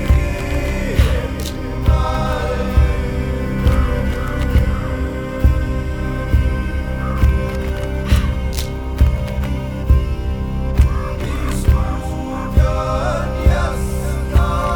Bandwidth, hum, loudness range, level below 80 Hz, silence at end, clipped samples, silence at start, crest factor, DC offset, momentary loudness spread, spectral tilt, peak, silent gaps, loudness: 19.5 kHz; none; 1 LU; -18 dBFS; 0 s; under 0.1%; 0 s; 16 dB; under 0.1%; 6 LU; -7 dB/octave; 0 dBFS; none; -19 LUFS